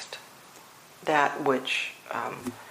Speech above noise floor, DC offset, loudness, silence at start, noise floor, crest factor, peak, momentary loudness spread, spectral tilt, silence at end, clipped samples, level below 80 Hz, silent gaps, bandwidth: 23 dB; under 0.1%; -28 LUFS; 0 s; -51 dBFS; 24 dB; -6 dBFS; 24 LU; -3.5 dB/octave; 0 s; under 0.1%; -74 dBFS; none; 15.5 kHz